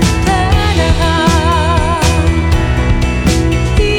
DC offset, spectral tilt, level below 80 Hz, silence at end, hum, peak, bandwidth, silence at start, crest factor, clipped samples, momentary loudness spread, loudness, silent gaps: under 0.1%; -5.5 dB/octave; -16 dBFS; 0 s; none; 0 dBFS; 16 kHz; 0 s; 10 dB; under 0.1%; 2 LU; -12 LUFS; none